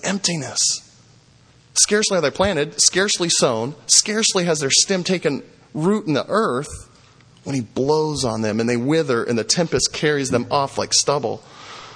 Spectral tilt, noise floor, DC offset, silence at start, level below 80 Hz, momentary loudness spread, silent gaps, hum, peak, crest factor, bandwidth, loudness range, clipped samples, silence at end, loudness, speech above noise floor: -2.5 dB/octave; -52 dBFS; under 0.1%; 0 s; -50 dBFS; 12 LU; none; none; 0 dBFS; 20 dB; 10.5 kHz; 5 LU; under 0.1%; 0 s; -18 LUFS; 32 dB